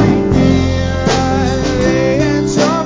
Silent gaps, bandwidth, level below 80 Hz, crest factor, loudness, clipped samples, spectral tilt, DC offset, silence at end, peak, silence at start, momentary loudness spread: none; 7.6 kHz; -24 dBFS; 12 dB; -13 LUFS; under 0.1%; -6 dB/octave; under 0.1%; 0 s; 0 dBFS; 0 s; 3 LU